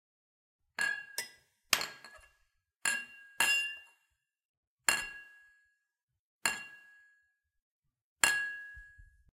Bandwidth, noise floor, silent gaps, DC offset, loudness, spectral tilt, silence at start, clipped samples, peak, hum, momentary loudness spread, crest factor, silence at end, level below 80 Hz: 16.5 kHz; -87 dBFS; 4.45-4.77 s, 6.03-6.08 s, 6.19-6.39 s, 7.62-7.82 s, 8.02-8.16 s; under 0.1%; -33 LUFS; 1.5 dB/octave; 0.8 s; under 0.1%; -6 dBFS; none; 21 LU; 32 dB; 0.35 s; -70 dBFS